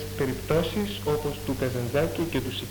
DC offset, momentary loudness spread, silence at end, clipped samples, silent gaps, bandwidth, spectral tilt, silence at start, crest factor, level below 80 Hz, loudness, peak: under 0.1%; 4 LU; 0 s; under 0.1%; none; 19 kHz; -5.5 dB/octave; 0 s; 16 dB; -44 dBFS; -28 LUFS; -10 dBFS